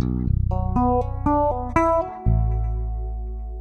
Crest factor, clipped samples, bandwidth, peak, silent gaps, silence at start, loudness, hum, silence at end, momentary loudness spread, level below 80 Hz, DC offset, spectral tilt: 18 dB; under 0.1%; 6.6 kHz; -4 dBFS; none; 0 s; -23 LUFS; none; 0 s; 10 LU; -26 dBFS; under 0.1%; -9.5 dB/octave